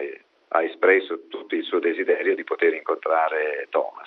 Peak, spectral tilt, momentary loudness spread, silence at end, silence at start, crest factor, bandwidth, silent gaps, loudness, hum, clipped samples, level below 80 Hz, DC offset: -4 dBFS; -5.5 dB/octave; 10 LU; 0 s; 0 s; 20 dB; 4.7 kHz; none; -23 LUFS; none; under 0.1%; -78 dBFS; under 0.1%